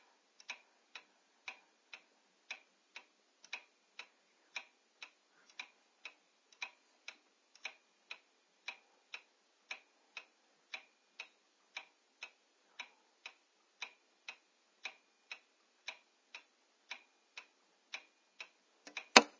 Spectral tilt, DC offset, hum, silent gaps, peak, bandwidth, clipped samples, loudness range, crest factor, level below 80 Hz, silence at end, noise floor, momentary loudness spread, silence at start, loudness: 0 dB/octave; under 0.1%; none; none; -2 dBFS; 7.8 kHz; under 0.1%; 2 LU; 44 dB; under -90 dBFS; 0.1 s; -73 dBFS; 8 LU; 0.5 s; -44 LUFS